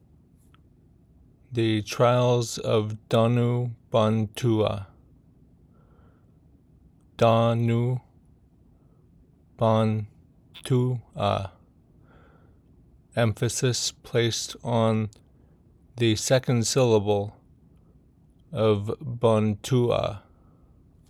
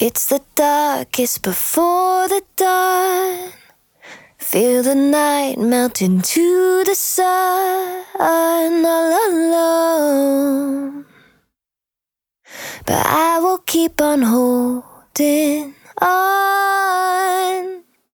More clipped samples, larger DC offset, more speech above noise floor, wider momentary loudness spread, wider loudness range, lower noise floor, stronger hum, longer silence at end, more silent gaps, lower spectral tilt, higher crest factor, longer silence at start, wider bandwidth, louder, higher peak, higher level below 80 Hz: neither; neither; second, 34 dB vs 71 dB; about the same, 11 LU vs 10 LU; about the same, 5 LU vs 4 LU; second, -58 dBFS vs -87 dBFS; neither; first, 0.9 s vs 0.35 s; neither; first, -5.5 dB/octave vs -3.5 dB/octave; about the same, 18 dB vs 14 dB; first, 1.5 s vs 0 s; second, 14 kHz vs over 20 kHz; second, -25 LUFS vs -16 LUFS; second, -8 dBFS vs -2 dBFS; about the same, -58 dBFS vs -56 dBFS